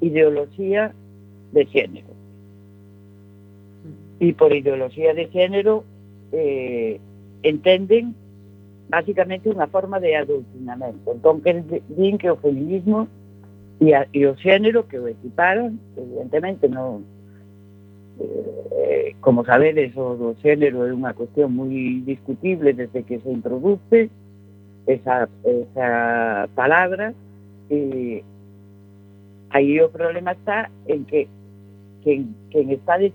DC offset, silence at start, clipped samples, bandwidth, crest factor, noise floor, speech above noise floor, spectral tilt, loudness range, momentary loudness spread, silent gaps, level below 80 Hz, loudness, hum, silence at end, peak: under 0.1%; 0 s; under 0.1%; 18.5 kHz; 20 dB; -46 dBFS; 27 dB; -8.5 dB/octave; 5 LU; 12 LU; none; -70 dBFS; -20 LUFS; none; 0 s; 0 dBFS